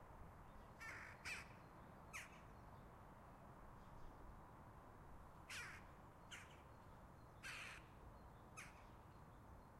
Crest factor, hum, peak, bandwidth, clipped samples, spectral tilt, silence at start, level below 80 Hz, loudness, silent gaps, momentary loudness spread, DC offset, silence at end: 20 dB; none; -40 dBFS; 15.5 kHz; under 0.1%; -3.5 dB/octave; 0 s; -68 dBFS; -59 LUFS; none; 11 LU; under 0.1%; 0 s